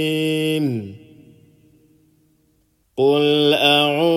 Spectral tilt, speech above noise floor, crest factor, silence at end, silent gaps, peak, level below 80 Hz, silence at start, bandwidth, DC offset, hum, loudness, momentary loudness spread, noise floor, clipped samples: -5 dB/octave; 45 dB; 18 dB; 0 s; none; -2 dBFS; -66 dBFS; 0 s; 16 kHz; under 0.1%; none; -17 LUFS; 15 LU; -63 dBFS; under 0.1%